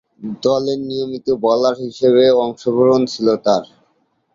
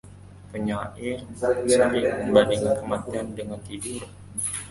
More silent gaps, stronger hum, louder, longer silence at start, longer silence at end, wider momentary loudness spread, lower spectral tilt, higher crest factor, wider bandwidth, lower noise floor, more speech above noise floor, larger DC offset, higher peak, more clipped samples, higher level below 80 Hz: neither; neither; first, -16 LUFS vs -25 LUFS; first, 0.2 s vs 0.05 s; first, 0.7 s vs 0 s; second, 9 LU vs 15 LU; first, -6 dB/octave vs -4.5 dB/octave; second, 14 dB vs 22 dB; second, 7.6 kHz vs 11.5 kHz; first, -63 dBFS vs -45 dBFS; first, 47 dB vs 20 dB; neither; about the same, -2 dBFS vs -4 dBFS; neither; second, -58 dBFS vs -50 dBFS